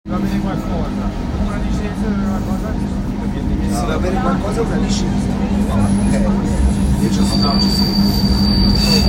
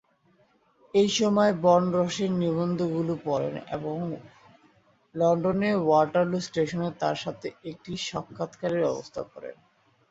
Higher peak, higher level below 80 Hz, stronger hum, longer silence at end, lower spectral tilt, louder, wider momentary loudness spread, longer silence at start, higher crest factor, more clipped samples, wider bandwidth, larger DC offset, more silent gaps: first, 0 dBFS vs -8 dBFS; first, -22 dBFS vs -62 dBFS; neither; second, 0 s vs 0.55 s; about the same, -6 dB/octave vs -6 dB/octave; first, -17 LUFS vs -26 LUFS; second, 7 LU vs 15 LU; second, 0.05 s vs 0.95 s; about the same, 14 dB vs 18 dB; neither; first, 16.5 kHz vs 8 kHz; neither; neither